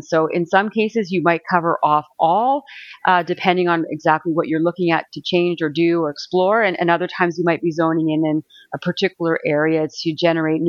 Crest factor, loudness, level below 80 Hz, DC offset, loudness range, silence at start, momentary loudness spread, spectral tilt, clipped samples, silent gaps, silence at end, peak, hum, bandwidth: 18 dB; -19 LUFS; -68 dBFS; under 0.1%; 1 LU; 0.1 s; 4 LU; -6.5 dB/octave; under 0.1%; none; 0 s; 0 dBFS; none; 7.2 kHz